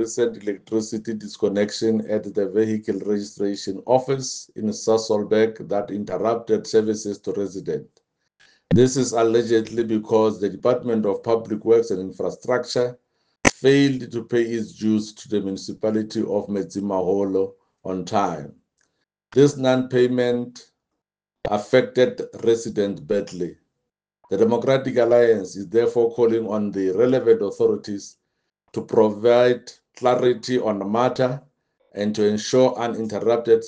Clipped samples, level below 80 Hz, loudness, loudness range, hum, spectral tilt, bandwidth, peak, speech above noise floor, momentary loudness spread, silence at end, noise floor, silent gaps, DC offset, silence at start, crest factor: under 0.1%; -58 dBFS; -21 LUFS; 4 LU; none; -5.5 dB/octave; 9.8 kHz; 0 dBFS; 62 dB; 11 LU; 0 s; -83 dBFS; none; under 0.1%; 0 s; 22 dB